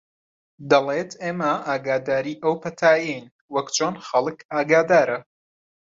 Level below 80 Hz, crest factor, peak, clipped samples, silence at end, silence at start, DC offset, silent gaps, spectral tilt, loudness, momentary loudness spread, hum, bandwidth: -66 dBFS; 20 dB; -2 dBFS; under 0.1%; 0.75 s; 0.6 s; under 0.1%; 3.31-3.48 s, 4.45-4.49 s; -4 dB/octave; -22 LUFS; 10 LU; none; 7.8 kHz